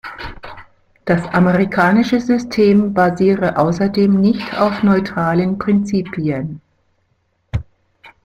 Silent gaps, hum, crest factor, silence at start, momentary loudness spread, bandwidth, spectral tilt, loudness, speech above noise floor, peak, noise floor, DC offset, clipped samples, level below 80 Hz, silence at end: none; none; 14 dB; 0.05 s; 16 LU; 8.2 kHz; -7.5 dB/octave; -16 LUFS; 49 dB; -2 dBFS; -64 dBFS; under 0.1%; under 0.1%; -42 dBFS; 0.15 s